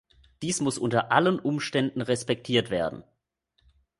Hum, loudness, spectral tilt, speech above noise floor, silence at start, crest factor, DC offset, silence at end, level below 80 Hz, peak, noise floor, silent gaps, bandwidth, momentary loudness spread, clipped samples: none; -26 LUFS; -4.5 dB/octave; 48 dB; 0.4 s; 22 dB; under 0.1%; 1 s; -60 dBFS; -6 dBFS; -74 dBFS; none; 11.5 kHz; 8 LU; under 0.1%